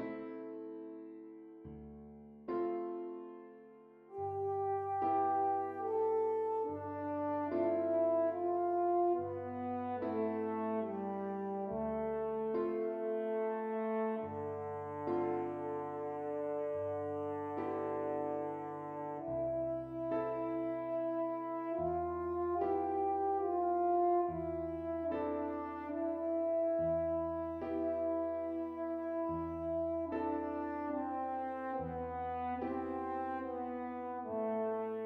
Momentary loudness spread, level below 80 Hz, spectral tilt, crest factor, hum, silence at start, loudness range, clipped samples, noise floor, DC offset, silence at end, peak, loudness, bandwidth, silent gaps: 9 LU; -66 dBFS; -10 dB/octave; 14 dB; none; 0 s; 5 LU; under 0.1%; -58 dBFS; under 0.1%; 0 s; -22 dBFS; -37 LUFS; 4.7 kHz; none